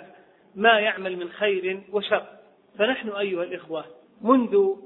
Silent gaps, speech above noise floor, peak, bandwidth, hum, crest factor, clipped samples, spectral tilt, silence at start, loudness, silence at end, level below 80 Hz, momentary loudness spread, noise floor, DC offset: none; 29 dB; -4 dBFS; 4.1 kHz; none; 22 dB; under 0.1%; -8 dB/octave; 0 s; -24 LUFS; 0 s; -72 dBFS; 13 LU; -52 dBFS; under 0.1%